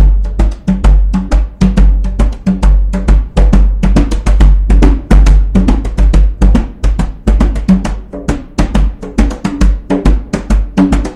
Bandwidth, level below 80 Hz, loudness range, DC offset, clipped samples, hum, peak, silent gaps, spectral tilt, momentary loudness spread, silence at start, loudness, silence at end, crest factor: 9.4 kHz; -10 dBFS; 4 LU; under 0.1%; 1%; none; 0 dBFS; none; -7.5 dB/octave; 6 LU; 0 s; -12 LUFS; 0 s; 8 dB